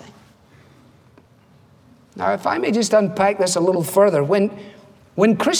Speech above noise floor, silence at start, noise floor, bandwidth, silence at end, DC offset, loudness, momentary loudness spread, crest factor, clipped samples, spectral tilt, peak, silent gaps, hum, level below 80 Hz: 35 dB; 2.15 s; -52 dBFS; over 20 kHz; 0 s; under 0.1%; -18 LUFS; 8 LU; 18 dB; under 0.1%; -4.5 dB/octave; -2 dBFS; none; none; -64 dBFS